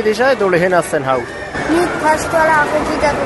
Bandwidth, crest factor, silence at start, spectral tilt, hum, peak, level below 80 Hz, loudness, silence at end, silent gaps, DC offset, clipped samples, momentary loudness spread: 12 kHz; 14 dB; 0 s; -4.5 dB/octave; none; 0 dBFS; -38 dBFS; -14 LUFS; 0 s; none; under 0.1%; under 0.1%; 6 LU